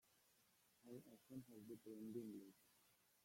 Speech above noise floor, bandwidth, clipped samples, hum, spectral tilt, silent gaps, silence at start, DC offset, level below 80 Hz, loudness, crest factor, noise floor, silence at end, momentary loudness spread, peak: 22 dB; 16.5 kHz; under 0.1%; none; -6.5 dB/octave; none; 0.05 s; under 0.1%; under -90 dBFS; -58 LUFS; 20 dB; -79 dBFS; 0 s; 8 LU; -40 dBFS